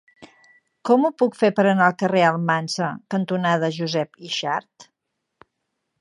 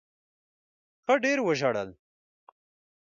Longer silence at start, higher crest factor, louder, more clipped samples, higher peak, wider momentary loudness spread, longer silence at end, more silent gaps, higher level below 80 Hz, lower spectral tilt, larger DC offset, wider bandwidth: second, 0.2 s vs 1.1 s; about the same, 20 dB vs 20 dB; first, -21 LUFS vs -27 LUFS; neither; first, -2 dBFS vs -10 dBFS; second, 9 LU vs 13 LU; about the same, 1.15 s vs 1.15 s; neither; about the same, -74 dBFS vs -72 dBFS; about the same, -5.5 dB/octave vs -4.5 dB/octave; neither; first, 11.5 kHz vs 7.6 kHz